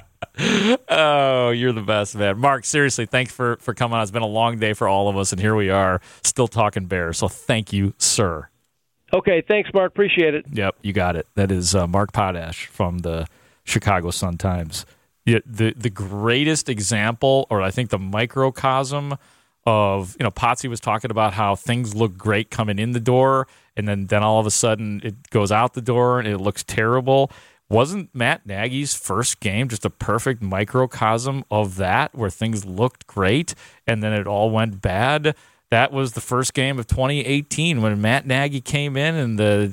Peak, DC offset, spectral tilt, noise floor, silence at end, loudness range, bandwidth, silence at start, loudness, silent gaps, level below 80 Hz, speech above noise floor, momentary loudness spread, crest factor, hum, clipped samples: -4 dBFS; under 0.1%; -4.5 dB/octave; -71 dBFS; 0 s; 2 LU; 17 kHz; 0.2 s; -20 LUFS; none; -46 dBFS; 51 dB; 7 LU; 16 dB; none; under 0.1%